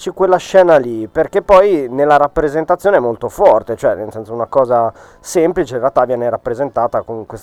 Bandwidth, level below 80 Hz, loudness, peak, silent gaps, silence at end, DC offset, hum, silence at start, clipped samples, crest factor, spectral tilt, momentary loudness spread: 14 kHz; -42 dBFS; -14 LUFS; 0 dBFS; none; 0.05 s; under 0.1%; none; 0 s; 0.2%; 14 dB; -6 dB/octave; 10 LU